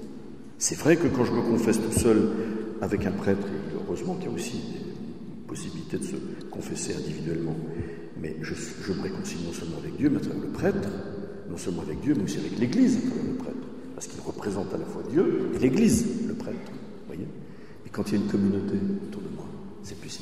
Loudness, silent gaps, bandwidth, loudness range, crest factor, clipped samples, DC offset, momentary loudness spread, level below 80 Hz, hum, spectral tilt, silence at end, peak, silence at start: -28 LUFS; none; 14.5 kHz; 8 LU; 22 dB; under 0.1%; 0.7%; 16 LU; -52 dBFS; none; -5.5 dB/octave; 0 s; -6 dBFS; 0 s